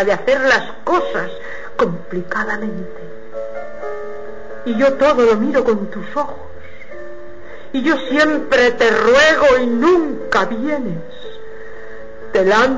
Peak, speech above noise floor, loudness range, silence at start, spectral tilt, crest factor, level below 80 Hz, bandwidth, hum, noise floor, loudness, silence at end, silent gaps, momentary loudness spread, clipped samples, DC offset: -4 dBFS; 21 dB; 9 LU; 0 s; -4.5 dB/octave; 14 dB; -46 dBFS; 8 kHz; none; -36 dBFS; -16 LUFS; 0 s; none; 22 LU; under 0.1%; 5%